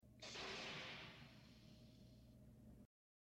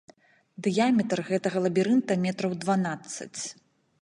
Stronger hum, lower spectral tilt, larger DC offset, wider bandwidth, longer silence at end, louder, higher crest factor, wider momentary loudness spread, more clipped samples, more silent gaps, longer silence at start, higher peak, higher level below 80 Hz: neither; second, -3 dB/octave vs -5.5 dB/octave; neither; first, 15.5 kHz vs 11.5 kHz; about the same, 0.5 s vs 0.5 s; second, -54 LUFS vs -27 LUFS; about the same, 18 dB vs 16 dB; first, 16 LU vs 12 LU; neither; neither; second, 0 s vs 0.6 s; second, -40 dBFS vs -12 dBFS; about the same, -74 dBFS vs -72 dBFS